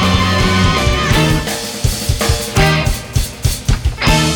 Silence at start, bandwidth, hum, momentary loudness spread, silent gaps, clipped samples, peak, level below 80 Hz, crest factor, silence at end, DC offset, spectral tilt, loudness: 0 s; 19.5 kHz; none; 6 LU; none; under 0.1%; 0 dBFS; -20 dBFS; 12 dB; 0 s; under 0.1%; -4.5 dB/octave; -14 LUFS